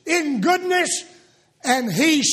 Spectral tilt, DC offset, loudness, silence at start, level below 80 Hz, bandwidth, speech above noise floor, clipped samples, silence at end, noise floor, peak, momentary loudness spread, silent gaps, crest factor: -2.5 dB/octave; under 0.1%; -20 LUFS; 0.05 s; -68 dBFS; 15.5 kHz; 35 dB; under 0.1%; 0 s; -54 dBFS; -4 dBFS; 7 LU; none; 18 dB